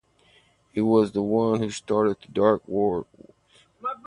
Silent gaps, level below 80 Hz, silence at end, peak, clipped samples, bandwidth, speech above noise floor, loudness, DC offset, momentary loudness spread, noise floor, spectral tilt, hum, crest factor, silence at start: none; -58 dBFS; 0.1 s; -4 dBFS; under 0.1%; 10.5 kHz; 37 dB; -24 LUFS; under 0.1%; 12 LU; -60 dBFS; -7 dB/octave; none; 20 dB; 0.75 s